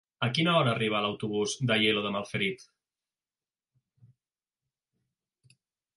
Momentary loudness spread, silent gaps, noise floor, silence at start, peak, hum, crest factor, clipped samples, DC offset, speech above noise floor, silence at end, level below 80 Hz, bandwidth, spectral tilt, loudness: 7 LU; none; under -90 dBFS; 0.2 s; -12 dBFS; none; 20 dB; under 0.1%; under 0.1%; over 62 dB; 3.35 s; -70 dBFS; 11.5 kHz; -4.5 dB/octave; -28 LUFS